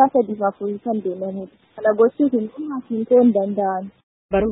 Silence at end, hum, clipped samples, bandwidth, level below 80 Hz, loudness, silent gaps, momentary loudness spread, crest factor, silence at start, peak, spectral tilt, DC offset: 0 s; none; under 0.1%; 3.9 kHz; -48 dBFS; -20 LUFS; 4.03-4.29 s; 14 LU; 18 dB; 0 s; -2 dBFS; -12.5 dB/octave; under 0.1%